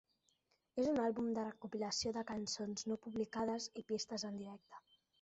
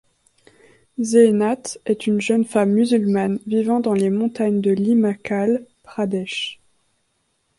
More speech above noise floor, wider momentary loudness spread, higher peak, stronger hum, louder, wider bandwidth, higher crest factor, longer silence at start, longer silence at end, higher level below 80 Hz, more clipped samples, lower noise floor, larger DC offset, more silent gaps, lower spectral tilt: second, 39 dB vs 50 dB; about the same, 12 LU vs 10 LU; second, -28 dBFS vs -2 dBFS; neither; second, -41 LUFS vs -19 LUFS; second, 8 kHz vs 11.5 kHz; about the same, 16 dB vs 18 dB; second, 0.75 s vs 1 s; second, 0.45 s vs 1.05 s; second, -74 dBFS vs -64 dBFS; neither; first, -80 dBFS vs -68 dBFS; neither; neither; second, -4 dB/octave vs -6 dB/octave